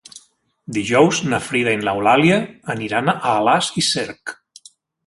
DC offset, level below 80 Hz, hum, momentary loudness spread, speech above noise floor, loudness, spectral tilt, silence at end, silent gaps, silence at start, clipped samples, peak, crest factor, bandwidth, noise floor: under 0.1%; -56 dBFS; none; 12 LU; 36 dB; -18 LUFS; -4 dB/octave; 0.75 s; none; 0.15 s; under 0.1%; -2 dBFS; 18 dB; 11.5 kHz; -54 dBFS